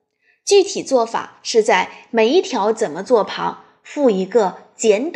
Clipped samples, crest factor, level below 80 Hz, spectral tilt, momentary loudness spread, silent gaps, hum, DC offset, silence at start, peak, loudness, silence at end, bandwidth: under 0.1%; 16 dB; -72 dBFS; -3.5 dB/octave; 10 LU; none; none; under 0.1%; 0.45 s; -2 dBFS; -18 LUFS; 0 s; 11 kHz